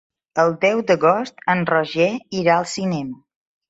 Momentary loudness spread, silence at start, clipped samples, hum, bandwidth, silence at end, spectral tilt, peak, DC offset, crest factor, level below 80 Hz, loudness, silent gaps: 8 LU; 0.35 s; under 0.1%; none; 8 kHz; 0.55 s; -5.5 dB/octave; -2 dBFS; under 0.1%; 16 dB; -62 dBFS; -19 LUFS; none